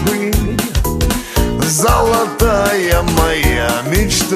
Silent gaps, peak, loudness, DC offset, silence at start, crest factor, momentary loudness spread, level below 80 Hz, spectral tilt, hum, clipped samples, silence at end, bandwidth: none; 0 dBFS; -14 LUFS; under 0.1%; 0 s; 14 dB; 5 LU; -20 dBFS; -4 dB/octave; none; under 0.1%; 0 s; 16 kHz